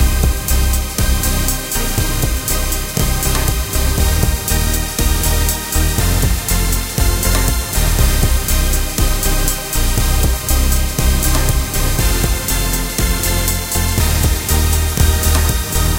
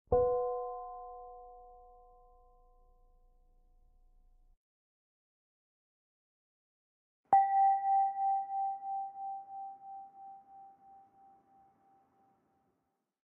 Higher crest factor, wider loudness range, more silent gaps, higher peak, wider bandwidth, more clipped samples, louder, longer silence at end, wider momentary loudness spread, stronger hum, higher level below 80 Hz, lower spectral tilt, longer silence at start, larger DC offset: second, 14 dB vs 22 dB; second, 1 LU vs 20 LU; second, none vs 4.57-7.24 s; first, 0 dBFS vs -16 dBFS; first, 17.5 kHz vs 2.1 kHz; neither; first, -16 LUFS vs -32 LUFS; second, 0 s vs 2.55 s; second, 3 LU vs 24 LU; neither; first, -16 dBFS vs -60 dBFS; first, -3.5 dB/octave vs -1 dB/octave; about the same, 0 s vs 0.1 s; neither